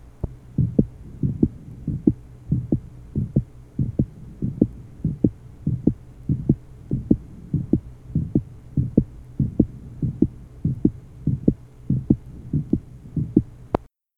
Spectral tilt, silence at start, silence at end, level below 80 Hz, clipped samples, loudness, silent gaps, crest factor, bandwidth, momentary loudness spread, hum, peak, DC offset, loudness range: -12 dB/octave; 0.05 s; 0.35 s; -38 dBFS; under 0.1%; -25 LUFS; none; 24 dB; 3.9 kHz; 8 LU; none; 0 dBFS; under 0.1%; 1 LU